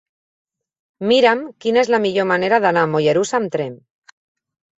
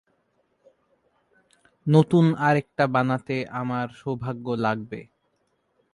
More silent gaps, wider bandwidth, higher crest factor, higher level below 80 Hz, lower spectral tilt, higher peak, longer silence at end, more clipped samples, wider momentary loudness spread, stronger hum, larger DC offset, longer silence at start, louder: neither; second, 8.2 kHz vs 11 kHz; about the same, 18 dB vs 20 dB; about the same, -64 dBFS vs -64 dBFS; second, -5 dB/octave vs -8 dB/octave; about the same, -2 dBFS vs -4 dBFS; about the same, 1 s vs 0.9 s; neither; second, 9 LU vs 12 LU; neither; neither; second, 1 s vs 1.85 s; first, -17 LUFS vs -24 LUFS